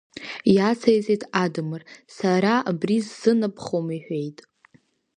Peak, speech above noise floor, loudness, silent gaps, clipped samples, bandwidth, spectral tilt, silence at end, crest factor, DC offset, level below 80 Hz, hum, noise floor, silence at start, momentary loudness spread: -4 dBFS; 38 dB; -23 LUFS; none; under 0.1%; 10 kHz; -6.5 dB/octave; 0.85 s; 20 dB; under 0.1%; -66 dBFS; none; -61 dBFS; 0.15 s; 11 LU